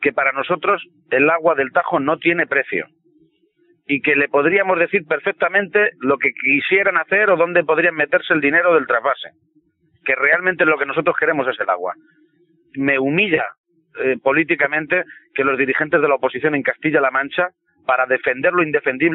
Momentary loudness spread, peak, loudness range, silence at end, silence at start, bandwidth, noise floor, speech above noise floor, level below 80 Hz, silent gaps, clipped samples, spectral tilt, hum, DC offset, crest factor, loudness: 8 LU; -2 dBFS; 3 LU; 0 s; 0 s; 4.1 kHz; -59 dBFS; 42 dB; -62 dBFS; 13.58-13.64 s; under 0.1%; -3 dB/octave; none; under 0.1%; 16 dB; -17 LUFS